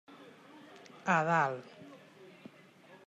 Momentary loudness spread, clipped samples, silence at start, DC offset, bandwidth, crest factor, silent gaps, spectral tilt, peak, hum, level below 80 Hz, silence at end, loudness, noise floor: 26 LU; under 0.1%; 0.1 s; under 0.1%; 9.8 kHz; 20 dB; none; -6 dB/octave; -16 dBFS; none; -90 dBFS; 0.8 s; -31 LUFS; -58 dBFS